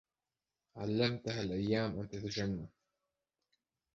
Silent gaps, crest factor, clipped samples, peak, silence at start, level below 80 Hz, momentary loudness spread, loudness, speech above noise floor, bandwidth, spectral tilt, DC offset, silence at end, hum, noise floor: none; 20 dB; under 0.1%; -20 dBFS; 0.75 s; -62 dBFS; 10 LU; -37 LUFS; over 54 dB; 7.6 kHz; -5 dB/octave; under 0.1%; 1.25 s; none; under -90 dBFS